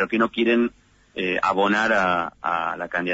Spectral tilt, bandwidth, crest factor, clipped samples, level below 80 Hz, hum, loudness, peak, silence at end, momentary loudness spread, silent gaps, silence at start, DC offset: -5.5 dB/octave; 8 kHz; 14 dB; under 0.1%; -58 dBFS; none; -22 LUFS; -8 dBFS; 0 s; 7 LU; none; 0 s; under 0.1%